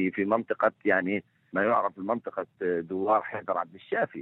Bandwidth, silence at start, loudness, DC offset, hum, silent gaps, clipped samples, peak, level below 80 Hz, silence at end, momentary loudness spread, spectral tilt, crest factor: 4.2 kHz; 0 s; -28 LUFS; under 0.1%; none; none; under 0.1%; -10 dBFS; -76 dBFS; 0 s; 7 LU; -9 dB/octave; 20 dB